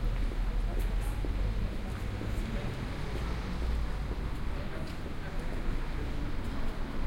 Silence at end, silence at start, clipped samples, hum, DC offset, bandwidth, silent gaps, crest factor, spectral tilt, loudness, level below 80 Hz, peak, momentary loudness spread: 0 s; 0 s; under 0.1%; none; under 0.1%; 15.5 kHz; none; 12 dB; -6.5 dB/octave; -37 LUFS; -34 dBFS; -20 dBFS; 4 LU